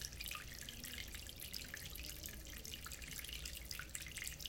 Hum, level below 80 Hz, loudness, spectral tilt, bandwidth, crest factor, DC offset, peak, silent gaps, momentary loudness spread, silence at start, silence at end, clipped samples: none; -56 dBFS; -48 LUFS; -1.5 dB/octave; 17 kHz; 24 dB; under 0.1%; -24 dBFS; none; 3 LU; 0 s; 0 s; under 0.1%